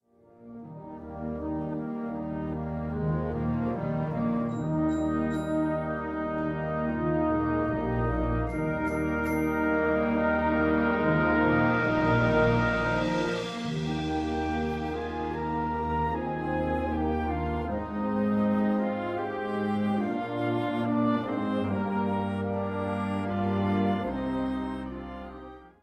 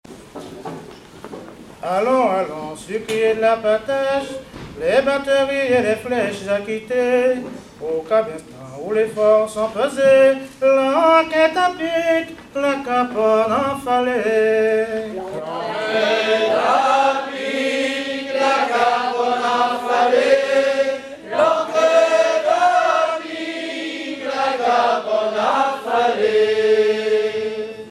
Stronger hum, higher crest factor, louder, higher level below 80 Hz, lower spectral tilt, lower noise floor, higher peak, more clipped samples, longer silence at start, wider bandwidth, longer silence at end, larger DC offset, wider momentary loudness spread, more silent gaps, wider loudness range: neither; about the same, 16 dB vs 18 dB; second, -28 LUFS vs -18 LUFS; first, -44 dBFS vs -56 dBFS; first, -8 dB/octave vs -4 dB/octave; first, -53 dBFS vs -38 dBFS; second, -12 dBFS vs 0 dBFS; neither; first, 0.4 s vs 0.1 s; about the same, 13.5 kHz vs 13 kHz; first, 0.15 s vs 0 s; neither; second, 9 LU vs 12 LU; neither; about the same, 6 LU vs 4 LU